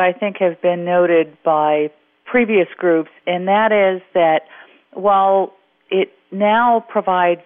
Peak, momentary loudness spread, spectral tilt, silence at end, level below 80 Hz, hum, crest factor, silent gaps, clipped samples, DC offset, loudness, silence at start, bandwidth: -6 dBFS; 7 LU; -3.5 dB/octave; 0.1 s; -62 dBFS; none; 12 dB; none; under 0.1%; under 0.1%; -17 LUFS; 0 s; 3.8 kHz